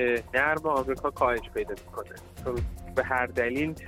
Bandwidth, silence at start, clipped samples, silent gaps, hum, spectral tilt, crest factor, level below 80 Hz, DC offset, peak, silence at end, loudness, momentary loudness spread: 16.5 kHz; 0 s; under 0.1%; none; none; -6 dB/octave; 18 dB; -44 dBFS; under 0.1%; -10 dBFS; 0 s; -28 LUFS; 13 LU